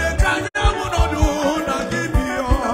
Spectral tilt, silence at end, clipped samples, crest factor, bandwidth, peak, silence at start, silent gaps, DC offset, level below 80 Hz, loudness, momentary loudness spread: -5 dB/octave; 0 s; under 0.1%; 16 dB; 16 kHz; -2 dBFS; 0 s; none; under 0.1%; -22 dBFS; -20 LUFS; 3 LU